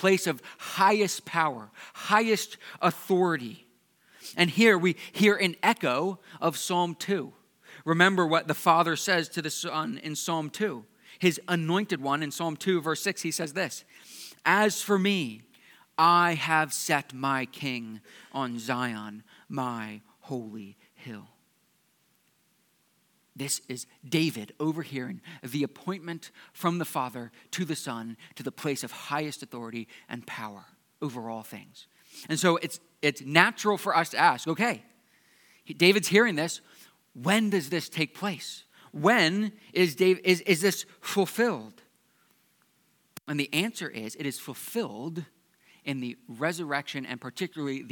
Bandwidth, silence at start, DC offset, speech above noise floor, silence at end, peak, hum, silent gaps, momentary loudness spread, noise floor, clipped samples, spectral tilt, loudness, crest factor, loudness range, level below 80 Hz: 19 kHz; 0 s; under 0.1%; 41 dB; 0 s; -2 dBFS; none; none; 17 LU; -69 dBFS; under 0.1%; -4 dB/octave; -27 LUFS; 28 dB; 10 LU; -86 dBFS